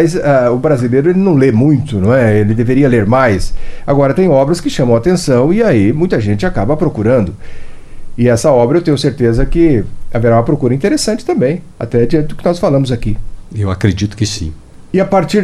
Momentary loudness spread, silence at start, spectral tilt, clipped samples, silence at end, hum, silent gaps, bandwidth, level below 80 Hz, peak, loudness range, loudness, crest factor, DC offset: 9 LU; 0 s; -7 dB/octave; under 0.1%; 0 s; none; none; 13 kHz; -26 dBFS; 0 dBFS; 4 LU; -12 LUFS; 12 dB; under 0.1%